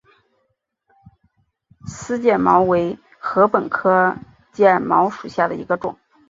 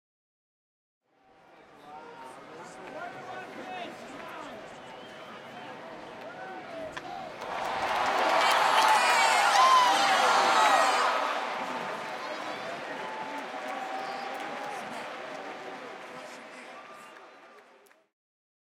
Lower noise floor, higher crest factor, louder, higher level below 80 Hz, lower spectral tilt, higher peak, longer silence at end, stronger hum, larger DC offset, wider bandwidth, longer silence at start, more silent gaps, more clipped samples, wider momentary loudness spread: first, -71 dBFS vs -61 dBFS; about the same, 18 dB vs 20 dB; first, -18 LUFS vs -26 LUFS; first, -56 dBFS vs -74 dBFS; first, -6.5 dB/octave vs -1 dB/octave; first, -2 dBFS vs -10 dBFS; second, 0.35 s vs 1 s; neither; neither; second, 7.8 kHz vs 16.5 kHz; about the same, 1.85 s vs 1.75 s; neither; neither; second, 18 LU vs 23 LU